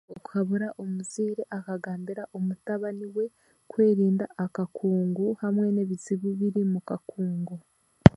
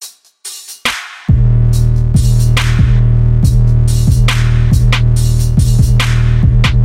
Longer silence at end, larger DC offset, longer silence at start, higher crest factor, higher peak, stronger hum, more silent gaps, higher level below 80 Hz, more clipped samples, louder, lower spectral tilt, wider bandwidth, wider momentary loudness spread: about the same, 0.05 s vs 0 s; neither; about the same, 0.1 s vs 0 s; first, 26 dB vs 10 dB; about the same, 0 dBFS vs 0 dBFS; neither; neither; second, -48 dBFS vs -14 dBFS; neither; second, -28 LUFS vs -11 LUFS; first, -8 dB/octave vs -5.5 dB/octave; second, 11.5 kHz vs 15 kHz; first, 10 LU vs 7 LU